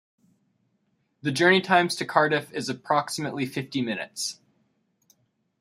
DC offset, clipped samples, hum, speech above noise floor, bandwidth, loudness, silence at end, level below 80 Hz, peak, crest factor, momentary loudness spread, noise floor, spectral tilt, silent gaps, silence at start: under 0.1%; under 0.1%; none; 47 dB; 15.5 kHz; -25 LUFS; 1.25 s; -72 dBFS; -4 dBFS; 24 dB; 12 LU; -72 dBFS; -4 dB/octave; none; 1.25 s